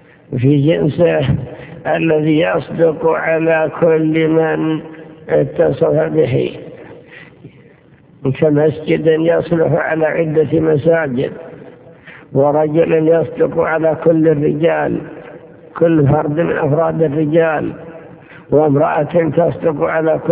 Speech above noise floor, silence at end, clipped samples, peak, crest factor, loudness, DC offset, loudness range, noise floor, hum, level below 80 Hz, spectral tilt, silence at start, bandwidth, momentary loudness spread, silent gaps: 32 dB; 0 s; under 0.1%; 0 dBFS; 14 dB; -14 LUFS; under 0.1%; 3 LU; -45 dBFS; none; -46 dBFS; -11.5 dB/octave; 0.3 s; 4 kHz; 10 LU; none